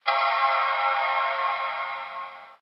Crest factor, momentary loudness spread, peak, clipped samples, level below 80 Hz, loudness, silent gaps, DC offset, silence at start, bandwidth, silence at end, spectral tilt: 18 dB; 13 LU; -8 dBFS; under 0.1%; -78 dBFS; -24 LUFS; none; under 0.1%; 0.05 s; 6 kHz; 0.05 s; -1.5 dB/octave